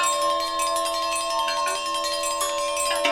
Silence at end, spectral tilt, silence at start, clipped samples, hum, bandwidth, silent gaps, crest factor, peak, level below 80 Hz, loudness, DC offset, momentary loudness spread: 0 s; 0.5 dB/octave; 0 s; under 0.1%; none; 16.5 kHz; none; 16 dB; -8 dBFS; -56 dBFS; -24 LUFS; under 0.1%; 2 LU